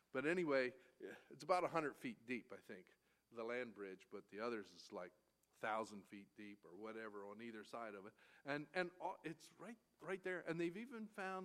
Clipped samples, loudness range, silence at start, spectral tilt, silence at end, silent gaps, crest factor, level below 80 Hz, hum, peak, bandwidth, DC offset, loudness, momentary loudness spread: under 0.1%; 6 LU; 0.15 s; -5.5 dB/octave; 0 s; none; 24 dB; under -90 dBFS; none; -24 dBFS; 15 kHz; under 0.1%; -47 LUFS; 17 LU